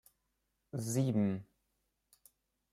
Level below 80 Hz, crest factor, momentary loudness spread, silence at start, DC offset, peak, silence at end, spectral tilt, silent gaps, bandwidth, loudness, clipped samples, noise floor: -76 dBFS; 18 dB; 12 LU; 0.75 s; under 0.1%; -22 dBFS; 1.3 s; -7 dB/octave; none; 16 kHz; -36 LUFS; under 0.1%; -83 dBFS